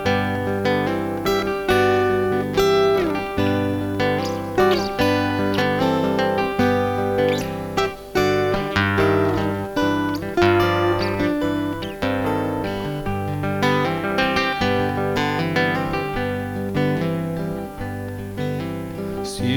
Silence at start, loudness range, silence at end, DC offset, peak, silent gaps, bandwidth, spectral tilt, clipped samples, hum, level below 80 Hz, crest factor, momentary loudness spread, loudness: 0 s; 3 LU; 0 s; under 0.1%; -2 dBFS; none; 20 kHz; -6 dB/octave; under 0.1%; 50 Hz at -45 dBFS; -42 dBFS; 18 dB; 8 LU; -21 LUFS